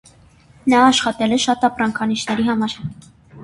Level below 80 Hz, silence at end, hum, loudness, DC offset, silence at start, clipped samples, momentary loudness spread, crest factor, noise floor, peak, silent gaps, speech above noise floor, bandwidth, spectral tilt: -52 dBFS; 0 s; none; -17 LUFS; under 0.1%; 0.65 s; under 0.1%; 11 LU; 18 dB; -49 dBFS; -2 dBFS; none; 32 dB; 11.5 kHz; -3.5 dB/octave